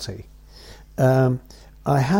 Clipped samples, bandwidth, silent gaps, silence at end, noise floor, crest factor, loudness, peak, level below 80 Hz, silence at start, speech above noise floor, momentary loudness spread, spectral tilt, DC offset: under 0.1%; 16.5 kHz; none; 0 s; -44 dBFS; 16 dB; -21 LUFS; -8 dBFS; -46 dBFS; 0 s; 24 dB; 18 LU; -7.5 dB/octave; under 0.1%